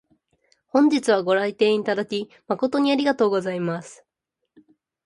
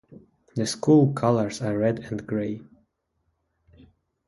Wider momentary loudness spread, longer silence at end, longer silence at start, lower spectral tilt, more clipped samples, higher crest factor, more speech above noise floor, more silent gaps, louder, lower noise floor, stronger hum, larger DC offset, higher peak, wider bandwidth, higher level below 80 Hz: second, 10 LU vs 14 LU; second, 1.1 s vs 1.65 s; first, 0.75 s vs 0.1 s; about the same, -5.5 dB/octave vs -6.5 dB/octave; neither; about the same, 18 dB vs 20 dB; first, 60 dB vs 51 dB; neither; about the same, -22 LUFS vs -24 LUFS; first, -81 dBFS vs -74 dBFS; neither; neither; about the same, -6 dBFS vs -6 dBFS; about the same, 11 kHz vs 11.5 kHz; second, -70 dBFS vs -60 dBFS